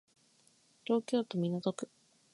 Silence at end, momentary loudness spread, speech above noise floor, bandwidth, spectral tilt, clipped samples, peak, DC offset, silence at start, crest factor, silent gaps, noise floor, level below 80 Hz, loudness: 0.45 s; 15 LU; 35 dB; 11.5 kHz; -6.5 dB/octave; under 0.1%; -18 dBFS; under 0.1%; 0.9 s; 20 dB; none; -69 dBFS; -84 dBFS; -35 LUFS